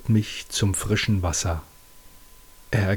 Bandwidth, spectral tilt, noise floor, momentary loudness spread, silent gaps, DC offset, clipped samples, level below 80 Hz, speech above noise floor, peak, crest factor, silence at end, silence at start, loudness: 19.5 kHz; -4.5 dB/octave; -48 dBFS; 6 LU; none; under 0.1%; under 0.1%; -40 dBFS; 25 dB; -8 dBFS; 18 dB; 0 s; 0 s; -25 LUFS